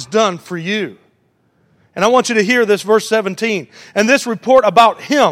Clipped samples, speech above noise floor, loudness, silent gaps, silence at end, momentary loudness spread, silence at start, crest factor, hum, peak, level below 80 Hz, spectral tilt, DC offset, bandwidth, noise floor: under 0.1%; 45 dB; -14 LUFS; none; 0 s; 11 LU; 0 s; 14 dB; none; 0 dBFS; -58 dBFS; -4 dB/octave; under 0.1%; 16.5 kHz; -59 dBFS